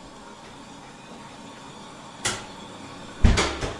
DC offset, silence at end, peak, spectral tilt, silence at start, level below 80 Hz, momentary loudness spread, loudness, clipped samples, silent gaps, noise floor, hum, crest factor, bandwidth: under 0.1%; 0 s; -2 dBFS; -4 dB/octave; 0 s; -32 dBFS; 21 LU; -26 LUFS; under 0.1%; none; -43 dBFS; none; 26 dB; 11.5 kHz